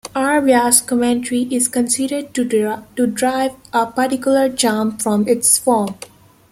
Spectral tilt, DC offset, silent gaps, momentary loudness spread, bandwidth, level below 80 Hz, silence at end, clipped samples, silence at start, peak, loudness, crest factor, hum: -3 dB/octave; under 0.1%; none; 8 LU; 16 kHz; -56 dBFS; 0.45 s; under 0.1%; 0.05 s; 0 dBFS; -16 LUFS; 16 dB; none